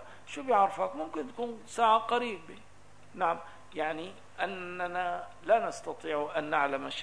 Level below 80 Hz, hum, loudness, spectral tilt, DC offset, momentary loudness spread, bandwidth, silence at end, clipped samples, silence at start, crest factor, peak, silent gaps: -68 dBFS; 50 Hz at -65 dBFS; -32 LUFS; -4 dB/octave; 0.3%; 14 LU; 11 kHz; 0 s; under 0.1%; 0 s; 20 dB; -12 dBFS; none